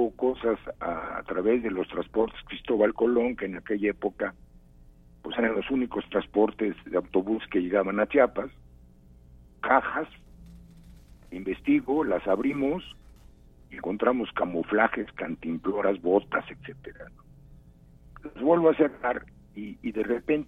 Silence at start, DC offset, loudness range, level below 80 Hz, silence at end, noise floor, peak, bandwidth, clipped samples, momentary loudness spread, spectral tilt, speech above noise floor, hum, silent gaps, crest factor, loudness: 0 s; under 0.1%; 3 LU; -54 dBFS; 0.05 s; -53 dBFS; -6 dBFS; 3.9 kHz; under 0.1%; 16 LU; -8 dB/octave; 26 dB; none; none; 22 dB; -27 LUFS